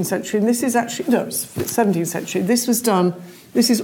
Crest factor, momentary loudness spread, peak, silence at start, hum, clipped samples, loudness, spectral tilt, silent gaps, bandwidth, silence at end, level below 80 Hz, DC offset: 16 dB; 6 LU; -4 dBFS; 0 s; none; under 0.1%; -19 LUFS; -4.5 dB/octave; none; 18 kHz; 0 s; -60 dBFS; under 0.1%